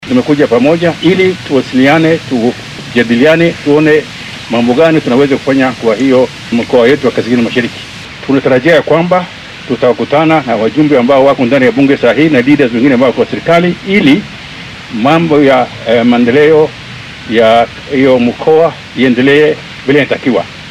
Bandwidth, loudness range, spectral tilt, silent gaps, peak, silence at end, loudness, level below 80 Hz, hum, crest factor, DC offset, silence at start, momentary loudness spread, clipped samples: 12 kHz; 2 LU; -6.5 dB/octave; none; 0 dBFS; 0 s; -9 LUFS; -44 dBFS; none; 8 dB; under 0.1%; 0 s; 8 LU; 1%